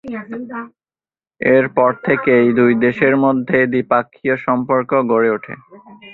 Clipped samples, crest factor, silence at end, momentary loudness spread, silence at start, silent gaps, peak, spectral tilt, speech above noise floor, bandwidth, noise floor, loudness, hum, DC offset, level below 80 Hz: under 0.1%; 16 dB; 0 s; 15 LU; 0.05 s; none; -2 dBFS; -9.5 dB/octave; over 74 dB; 4.2 kHz; under -90 dBFS; -15 LUFS; none; under 0.1%; -58 dBFS